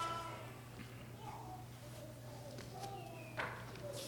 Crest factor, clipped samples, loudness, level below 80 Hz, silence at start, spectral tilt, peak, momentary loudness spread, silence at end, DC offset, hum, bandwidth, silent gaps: 20 dB; under 0.1%; -49 LUFS; -66 dBFS; 0 s; -4.5 dB/octave; -28 dBFS; 8 LU; 0 s; under 0.1%; none; 19 kHz; none